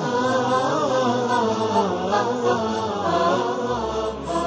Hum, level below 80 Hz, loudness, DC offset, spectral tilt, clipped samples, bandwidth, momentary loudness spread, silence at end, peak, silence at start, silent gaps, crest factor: none; -48 dBFS; -22 LUFS; under 0.1%; -5 dB/octave; under 0.1%; 8 kHz; 4 LU; 0 s; -8 dBFS; 0 s; none; 14 dB